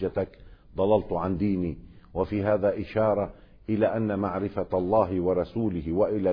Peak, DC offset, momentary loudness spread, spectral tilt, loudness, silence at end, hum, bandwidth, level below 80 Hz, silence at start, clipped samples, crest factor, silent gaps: -10 dBFS; under 0.1%; 10 LU; -11 dB/octave; -27 LUFS; 0 s; none; 5.2 kHz; -48 dBFS; 0 s; under 0.1%; 16 dB; none